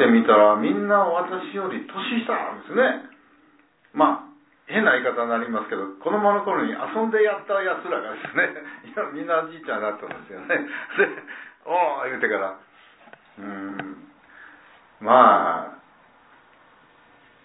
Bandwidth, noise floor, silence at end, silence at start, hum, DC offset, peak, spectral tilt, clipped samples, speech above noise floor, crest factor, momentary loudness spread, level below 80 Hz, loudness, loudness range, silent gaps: 4 kHz; -58 dBFS; 1.7 s; 0 s; none; under 0.1%; -2 dBFS; -9 dB/octave; under 0.1%; 36 dB; 22 dB; 19 LU; -76 dBFS; -22 LUFS; 4 LU; none